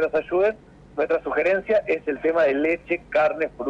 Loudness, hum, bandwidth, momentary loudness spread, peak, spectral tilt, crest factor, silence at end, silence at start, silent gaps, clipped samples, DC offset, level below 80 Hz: -22 LUFS; none; 7.6 kHz; 6 LU; -12 dBFS; -6.5 dB/octave; 10 dB; 0 s; 0 s; none; under 0.1%; under 0.1%; -54 dBFS